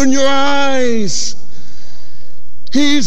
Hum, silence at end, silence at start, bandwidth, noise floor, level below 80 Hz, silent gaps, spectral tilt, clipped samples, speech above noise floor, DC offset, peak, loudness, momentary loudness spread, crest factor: none; 0 s; 0 s; 10 kHz; -39 dBFS; -44 dBFS; none; -3.5 dB/octave; under 0.1%; 25 dB; 40%; 0 dBFS; -15 LUFS; 8 LU; 12 dB